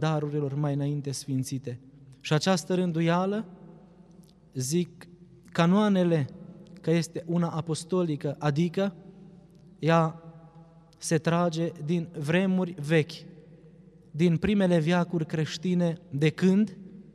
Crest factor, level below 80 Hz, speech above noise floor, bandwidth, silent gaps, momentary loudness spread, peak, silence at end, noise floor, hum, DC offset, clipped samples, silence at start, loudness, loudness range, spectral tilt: 18 dB; -62 dBFS; 28 dB; 12.5 kHz; none; 13 LU; -8 dBFS; 0.15 s; -54 dBFS; none; under 0.1%; under 0.1%; 0 s; -27 LUFS; 3 LU; -6.5 dB/octave